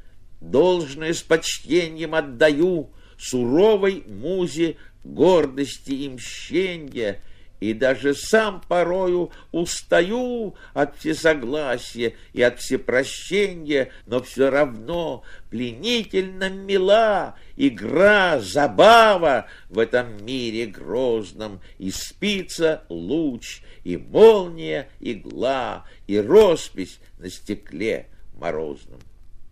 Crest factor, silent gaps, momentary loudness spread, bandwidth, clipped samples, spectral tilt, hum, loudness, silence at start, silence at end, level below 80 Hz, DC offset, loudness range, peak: 20 dB; none; 16 LU; 15.5 kHz; under 0.1%; -4.5 dB/octave; none; -21 LUFS; 0.05 s; 0.05 s; -46 dBFS; under 0.1%; 7 LU; -2 dBFS